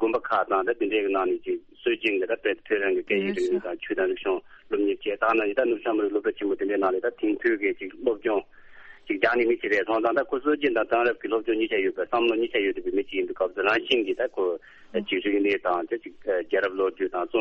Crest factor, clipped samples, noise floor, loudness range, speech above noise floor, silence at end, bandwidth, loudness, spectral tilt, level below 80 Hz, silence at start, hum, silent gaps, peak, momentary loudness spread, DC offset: 18 dB; under 0.1%; -47 dBFS; 2 LU; 22 dB; 0 s; 8 kHz; -26 LUFS; -5.5 dB/octave; -62 dBFS; 0 s; none; none; -6 dBFS; 6 LU; under 0.1%